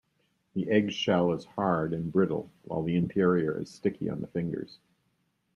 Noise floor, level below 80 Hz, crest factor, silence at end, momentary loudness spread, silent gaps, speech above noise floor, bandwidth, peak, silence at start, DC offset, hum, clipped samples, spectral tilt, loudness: -74 dBFS; -64 dBFS; 18 dB; 0.8 s; 10 LU; none; 46 dB; 10.5 kHz; -12 dBFS; 0.55 s; under 0.1%; none; under 0.1%; -7 dB/octave; -29 LUFS